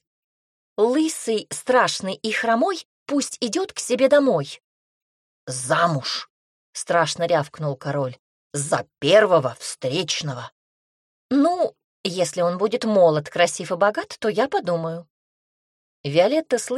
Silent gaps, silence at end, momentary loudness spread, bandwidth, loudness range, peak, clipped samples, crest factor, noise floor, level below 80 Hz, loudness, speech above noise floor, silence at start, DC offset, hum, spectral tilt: 2.85-3.06 s, 4.64-5.47 s, 6.30-6.73 s, 8.19-8.50 s, 10.52-11.29 s, 11.84-12.04 s, 15.10-16.04 s; 0 s; 14 LU; 13.5 kHz; 3 LU; -4 dBFS; under 0.1%; 18 dB; under -90 dBFS; -68 dBFS; -22 LUFS; over 69 dB; 0.8 s; under 0.1%; none; -4 dB/octave